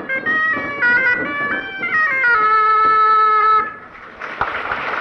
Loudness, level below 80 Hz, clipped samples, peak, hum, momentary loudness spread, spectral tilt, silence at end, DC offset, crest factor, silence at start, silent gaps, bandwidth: -15 LUFS; -52 dBFS; under 0.1%; -6 dBFS; none; 11 LU; -5 dB/octave; 0 s; under 0.1%; 10 dB; 0 s; none; 6.2 kHz